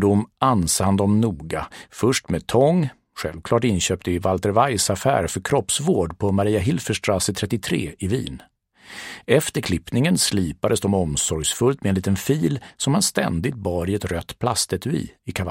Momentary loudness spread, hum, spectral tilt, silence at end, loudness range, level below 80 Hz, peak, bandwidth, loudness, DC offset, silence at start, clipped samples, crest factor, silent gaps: 10 LU; none; -4.5 dB/octave; 0 s; 3 LU; -44 dBFS; -2 dBFS; 16.5 kHz; -21 LUFS; under 0.1%; 0 s; under 0.1%; 20 dB; none